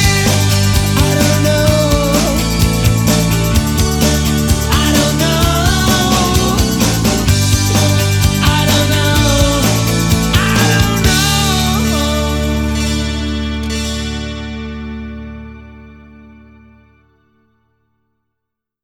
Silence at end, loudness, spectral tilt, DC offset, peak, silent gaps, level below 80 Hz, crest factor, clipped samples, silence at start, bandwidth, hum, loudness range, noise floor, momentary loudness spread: 2.9 s; -13 LUFS; -4.5 dB/octave; under 0.1%; 0 dBFS; none; -22 dBFS; 14 dB; under 0.1%; 0 s; over 20 kHz; none; 11 LU; -77 dBFS; 9 LU